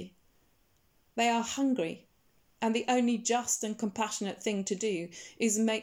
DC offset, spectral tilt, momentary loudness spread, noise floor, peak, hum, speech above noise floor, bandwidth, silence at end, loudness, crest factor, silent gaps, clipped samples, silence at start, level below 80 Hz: under 0.1%; -3 dB/octave; 9 LU; -70 dBFS; -14 dBFS; none; 39 dB; 17.5 kHz; 0 s; -31 LUFS; 18 dB; none; under 0.1%; 0 s; -74 dBFS